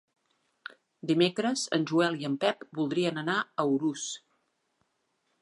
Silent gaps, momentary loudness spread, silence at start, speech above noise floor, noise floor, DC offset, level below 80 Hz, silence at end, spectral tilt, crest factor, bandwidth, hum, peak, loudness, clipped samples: none; 17 LU; 1.05 s; 48 dB; -77 dBFS; under 0.1%; -80 dBFS; 1.25 s; -4.5 dB/octave; 20 dB; 11.5 kHz; none; -12 dBFS; -29 LUFS; under 0.1%